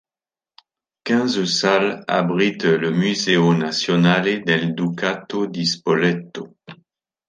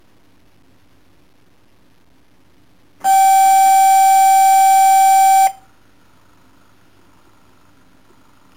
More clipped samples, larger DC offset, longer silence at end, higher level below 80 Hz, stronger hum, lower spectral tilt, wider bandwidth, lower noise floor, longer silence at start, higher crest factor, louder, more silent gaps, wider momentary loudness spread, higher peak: neither; second, under 0.1% vs 0.3%; second, 0.55 s vs 3.05 s; about the same, -64 dBFS vs -62 dBFS; neither; first, -5 dB/octave vs 1.5 dB/octave; second, 9.6 kHz vs 17 kHz; first, under -90 dBFS vs -55 dBFS; second, 1.05 s vs 3.05 s; first, 18 dB vs 8 dB; second, -19 LUFS vs -11 LUFS; neither; first, 8 LU vs 4 LU; first, -2 dBFS vs -6 dBFS